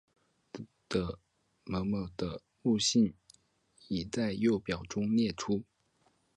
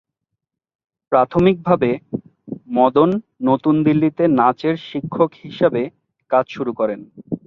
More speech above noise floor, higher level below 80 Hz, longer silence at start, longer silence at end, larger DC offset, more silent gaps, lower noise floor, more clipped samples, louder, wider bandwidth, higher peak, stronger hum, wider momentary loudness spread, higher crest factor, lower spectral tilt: second, 41 dB vs 62 dB; about the same, -56 dBFS vs -54 dBFS; second, 0.55 s vs 1.1 s; first, 0.75 s vs 0.1 s; neither; neither; second, -72 dBFS vs -79 dBFS; neither; second, -33 LUFS vs -18 LUFS; first, 10.5 kHz vs 6.2 kHz; second, -16 dBFS vs 0 dBFS; neither; first, 20 LU vs 14 LU; about the same, 18 dB vs 18 dB; second, -5 dB/octave vs -9.5 dB/octave